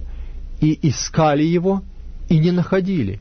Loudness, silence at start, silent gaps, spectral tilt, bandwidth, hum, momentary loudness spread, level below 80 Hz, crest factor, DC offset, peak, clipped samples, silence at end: -18 LUFS; 0 s; none; -6.5 dB/octave; 6.6 kHz; none; 19 LU; -34 dBFS; 14 dB; under 0.1%; -6 dBFS; under 0.1%; 0 s